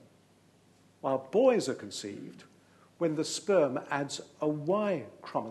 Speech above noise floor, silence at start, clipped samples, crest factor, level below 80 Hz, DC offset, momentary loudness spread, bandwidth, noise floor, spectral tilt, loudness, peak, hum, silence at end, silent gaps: 33 dB; 1.05 s; under 0.1%; 18 dB; -82 dBFS; under 0.1%; 13 LU; 12.5 kHz; -63 dBFS; -5 dB/octave; -31 LUFS; -14 dBFS; none; 0 s; none